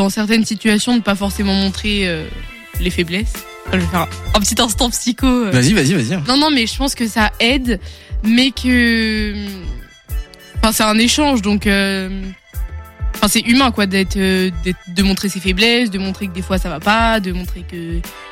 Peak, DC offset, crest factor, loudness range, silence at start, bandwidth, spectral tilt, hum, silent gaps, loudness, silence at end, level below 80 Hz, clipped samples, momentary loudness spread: -2 dBFS; under 0.1%; 14 dB; 3 LU; 0 s; 17 kHz; -4 dB/octave; none; none; -15 LUFS; 0 s; -28 dBFS; under 0.1%; 16 LU